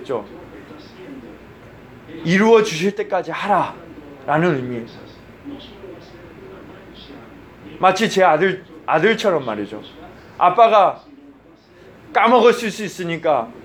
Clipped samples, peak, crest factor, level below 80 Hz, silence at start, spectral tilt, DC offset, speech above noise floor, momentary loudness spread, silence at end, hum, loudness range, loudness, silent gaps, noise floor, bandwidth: under 0.1%; 0 dBFS; 18 dB; -56 dBFS; 0 s; -5 dB/octave; under 0.1%; 30 dB; 26 LU; 0.05 s; none; 9 LU; -17 LUFS; none; -47 dBFS; 16 kHz